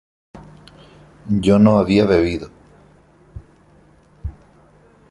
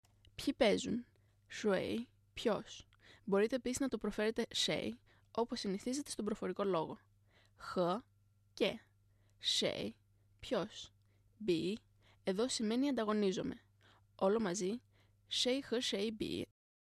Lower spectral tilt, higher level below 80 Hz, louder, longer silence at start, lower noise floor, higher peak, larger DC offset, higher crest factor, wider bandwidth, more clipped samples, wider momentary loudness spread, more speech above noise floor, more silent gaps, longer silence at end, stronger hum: first, -7.5 dB/octave vs -4 dB/octave; first, -40 dBFS vs -68 dBFS; first, -16 LUFS vs -38 LUFS; about the same, 0.35 s vs 0.4 s; second, -51 dBFS vs -71 dBFS; first, -2 dBFS vs -18 dBFS; neither; about the same, 18 dB vs 22 dB; second, 11 kHz vs 13.5 kHz; neither; first, 22 LU vs 15 LU; about the same, 37 dB vs 34 dB; neither; first, 0.8 s vs 0.45 s; first, 50 Hz at -45 dBFS vs 50 Hz at -65 dBFS